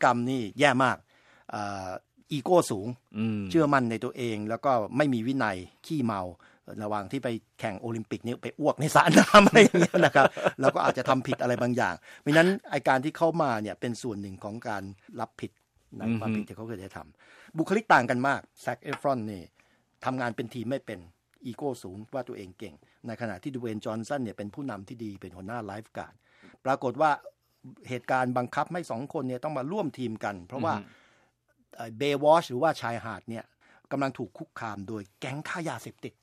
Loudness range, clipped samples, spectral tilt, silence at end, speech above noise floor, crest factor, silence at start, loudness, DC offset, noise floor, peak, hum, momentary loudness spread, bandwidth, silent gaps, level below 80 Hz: 15 LU; under 0.1%; -5.5 dB/octave; 0.1 s; 42 dB; 24 dB; 0 s; -27 LUFS; under 0.1%; -69 dBFS; -4 dBFS; none; 18 LU; 15 kHz; none; -62 dBFS